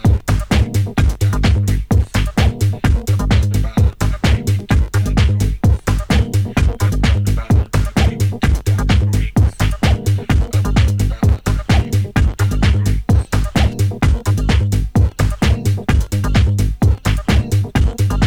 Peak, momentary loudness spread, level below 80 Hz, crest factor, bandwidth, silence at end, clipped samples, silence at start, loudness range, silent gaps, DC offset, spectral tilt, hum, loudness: 0 dBFS; 2 LU; -18 dBFS; 14 dB; 16 kHz; 0 s; under 0.1%; 0 s; 0 LU; none; under 0.1%; -6.5 dB/octave; none; -16 LUFS